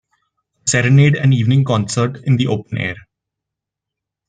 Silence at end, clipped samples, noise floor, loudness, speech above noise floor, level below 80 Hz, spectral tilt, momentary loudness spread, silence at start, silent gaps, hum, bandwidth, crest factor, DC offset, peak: 1.3 s; under 0.1%; -83 dBFS; -15 LUFS; 69 dB; -52 dBFS; -5.5 dB/octave; 11 LU; 0.65 s; none; none; 9.4 kHz; 14 dB; under 0.1%; -2 dBFS